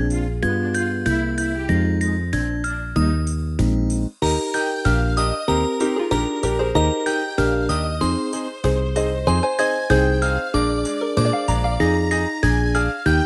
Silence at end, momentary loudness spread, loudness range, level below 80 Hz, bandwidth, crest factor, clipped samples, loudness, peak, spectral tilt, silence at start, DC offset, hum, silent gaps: 0 s; 4 LU; 2 LU; -26 dBFS; 11.5 kHz; 18 dB; under 0.1%; -21 LUFS; -2 dBFS; -5.5 dB/octave; 0 s; under 0.1%; none; none